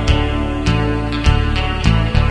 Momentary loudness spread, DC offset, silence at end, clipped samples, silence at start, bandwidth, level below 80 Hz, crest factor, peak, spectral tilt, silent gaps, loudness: 3 LU; 0.4%; 0 s; under 0.1%; 0 s; 10.5 kHz; -18 dBFS; 14 dB; 0 dBFS; -6.5 dB/octave; none; -17 LUFS